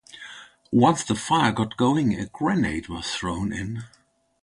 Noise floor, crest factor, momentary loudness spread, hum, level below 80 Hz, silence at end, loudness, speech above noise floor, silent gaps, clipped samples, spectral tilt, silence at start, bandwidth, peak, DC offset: -44 dBFS; 20 dB; 18 LU; none; -48 dBFS; 0.55 s; -24 LUFS; 21 dB; none; under 0.1%; -5 dB/octave; 0.15 s; 11.5 kHz; -4 dBFS; under 0.1%